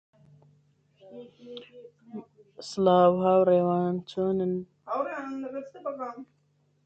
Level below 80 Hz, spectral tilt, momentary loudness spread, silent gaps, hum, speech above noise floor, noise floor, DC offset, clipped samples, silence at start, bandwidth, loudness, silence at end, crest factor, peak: -68 dBFS; -7.5 dB/octave; 24 LU; none; none; 43 dB; -69 dBFS; under 0.1%; under 0.1%; 1.05 s; 8.4 kHz; -26 LUFS; 0.6 s; 20 dB; -8 dBFS